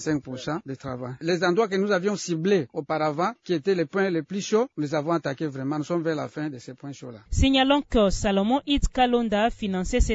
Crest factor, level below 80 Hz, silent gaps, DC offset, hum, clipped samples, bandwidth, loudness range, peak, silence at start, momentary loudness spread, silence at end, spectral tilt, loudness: 16 dB; -36 dBFS; none; under 0.1%; none; under 0.1%; 8 kHz; 4 LU; -8 dBFS; 0 s; 11 LU; 0 s; -5.5 dB/octave; -25 LUFS